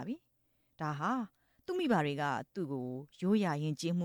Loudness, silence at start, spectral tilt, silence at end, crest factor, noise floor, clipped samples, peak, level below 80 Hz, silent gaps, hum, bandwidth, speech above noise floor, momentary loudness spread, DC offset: -35 LUFS; 0 s; -6.5 dB/octave; 0 s; 18 dB; -76 dBFS; under 0.1%; -18 dBFS; -74 dBFS; none; none; 20 kHz; 41 dB; 12 LU; under 0.1%